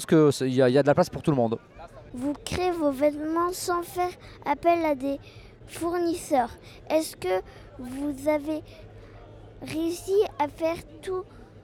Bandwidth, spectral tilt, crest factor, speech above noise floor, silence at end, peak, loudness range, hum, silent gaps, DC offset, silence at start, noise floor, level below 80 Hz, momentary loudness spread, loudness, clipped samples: 17.5 kHz; -6 dB/octave; 18 dB; 20 dB; 0 s; -8 dBFS; 5 LU; none; none; under 0.1%; 0 s; -46 dBFS; -52 dBFS; 19 LU; -26 LUFS; under 0.1%